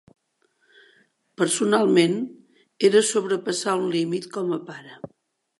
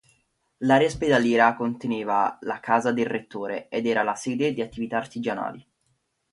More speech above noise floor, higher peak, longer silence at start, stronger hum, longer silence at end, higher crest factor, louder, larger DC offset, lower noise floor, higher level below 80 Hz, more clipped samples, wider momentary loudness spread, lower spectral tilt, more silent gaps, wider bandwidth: about the same, 47 dB vs 48 dB; about the same, -6 dBFS vs -4 dBFS; first, 1.4 s vs 0.6 s; neither; second, 0.55 s vs 0.7 s; about the same, 18 dB vs 20 dB; about the same, -22 LUFS vs -24 LUFS; neither; second, -68 dBFS vs -72 dBFS; second, -76 dBFS vs -58 dBFS; neither; first, 21 LU vs 11 LU; second, -4 dB/octave vs -5.5 dB/octave; neither; about the same, 12 kHz vs 11.5 kHz